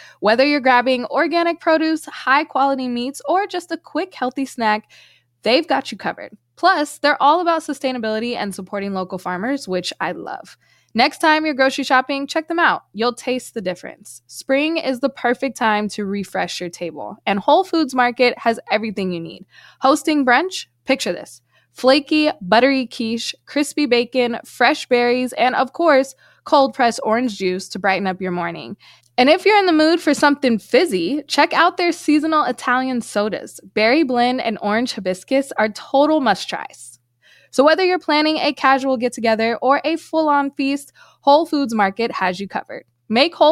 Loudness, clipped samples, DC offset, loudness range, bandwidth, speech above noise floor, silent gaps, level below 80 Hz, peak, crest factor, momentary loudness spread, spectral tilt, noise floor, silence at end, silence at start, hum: -18 LUFS; under 0.1%; under 0.1%; 4 LU; 15 kHz; 36 dB; none; -66 dBFS; -2 dBFS; 16 dB; 11 LU; -4 dB/octave; -54 dBFS; 0 s; 0 s; none